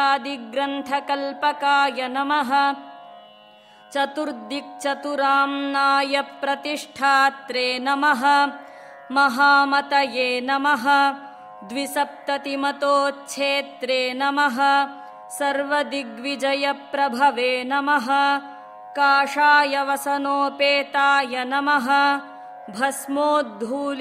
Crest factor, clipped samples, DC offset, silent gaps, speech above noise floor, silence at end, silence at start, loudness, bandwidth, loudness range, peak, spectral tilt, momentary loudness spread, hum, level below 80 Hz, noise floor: 16 dB; under 0.1%; under 0.1%; none; 28 dB; 0 s; 0 s; -21 LUFS; 15.5 kHz; 4 LU; -4 dBFS; -2 dB/octave; 11 LU; none; -76 dBFS; -49 dBFS